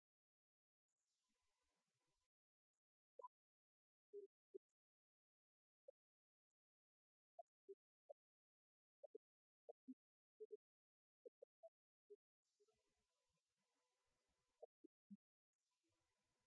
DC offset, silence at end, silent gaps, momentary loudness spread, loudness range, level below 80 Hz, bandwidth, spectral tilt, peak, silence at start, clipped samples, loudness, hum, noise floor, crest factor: under 0.1%; 1.3 s; 3.27-4.13 s, 4.26-7.68 s, 7.74-10.50 s, 10.56-12.43 s, 14.65-15.10 s; 6 LU; 1 LU; under -90 dBFS; 2 kHz; -5 dB/octave; -48 dBFS; 3.2 s; under 0.1%; -67 LUFS; none; under -90 dBFS; 24 dB